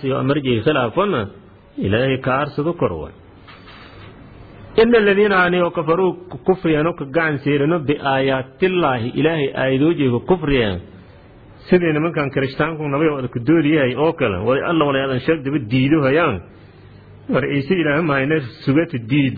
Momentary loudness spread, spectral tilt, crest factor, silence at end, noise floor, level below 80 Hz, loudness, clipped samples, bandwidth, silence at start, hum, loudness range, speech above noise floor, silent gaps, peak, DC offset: 6 LU; -10 dB/octave; 16 dB; 0 s; -43 dBFS; -44 dBFS; -18 LUFS; under 0.1%; 4.9 kHz; 0 s; none; 3 LU; 26 dB; none; -2 dBFS; under 0.1%